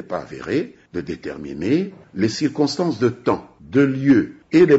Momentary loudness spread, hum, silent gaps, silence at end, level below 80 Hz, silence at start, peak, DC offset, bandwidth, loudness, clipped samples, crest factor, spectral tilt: 13 LU; none; none; 0 s; -54 dBFS; 0 s; -4 dBFS; under 0.1%; 8 kHz; -21 LUFS; under 0.1%; 14 dB; -6 dB/octave